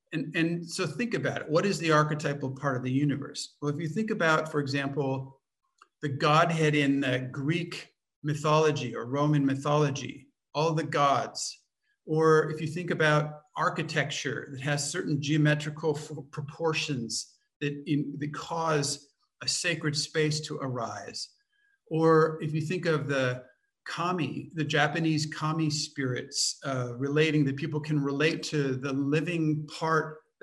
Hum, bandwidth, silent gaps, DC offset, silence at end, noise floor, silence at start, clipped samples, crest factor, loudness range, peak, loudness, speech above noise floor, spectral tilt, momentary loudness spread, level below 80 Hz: none; 12 kHz; 8.16-8.22 s, 17.56-17.60 s; under 0.1%; 0.25 s; -71 dBFS; 0.1 s; under 0.1%; 20 dB; 3 LU; -10 dBFS; -29 LUFS; 43 dB; -5 dB/octave; 11 LU; -72 dBFS